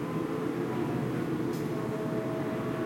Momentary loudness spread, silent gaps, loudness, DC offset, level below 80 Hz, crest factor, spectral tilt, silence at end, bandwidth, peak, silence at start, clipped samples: 1 LU; none; -32 LUFS; under 0.1%; -62 dBFS; 12 dB; -7.5 dB/octave; 0 s; 16 kHz; -20 dBFS; 0 s; under 0.1%